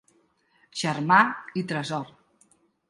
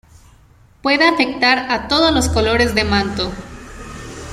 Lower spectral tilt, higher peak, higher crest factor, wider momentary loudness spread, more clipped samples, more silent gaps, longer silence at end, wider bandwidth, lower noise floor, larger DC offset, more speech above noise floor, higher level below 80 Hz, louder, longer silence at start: about the same, -4.5 dB/octave vs -4 dB/octave; about the same, -4 dBFS vs -2 dBFS; first, 22 dB vs 16 dB; second, 16 LU vs 19 LU; neither; neither; first, 0.8 s vs 0 s; second, 11.5 kHz vs 15.5 kHz; first, -66 dBFS vs -48 dBFS; neither; first, 41 dB vs 33 dB; second, -72 dBFS vs -34 dBFS; second, -24 LUFS vs -15 LUFS; about the same, 0.75 s vs 0.85 s